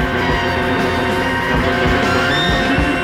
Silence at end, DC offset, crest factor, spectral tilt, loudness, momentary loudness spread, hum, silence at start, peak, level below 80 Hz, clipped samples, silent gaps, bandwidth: 0 s; under 0.1%; 14 dB; -5.5 dB/octave; -15 LUFS; 2 LU; none; 0 s; -2 dBFS; -28 dBFS; under 0.1%; none; 16.5 kHz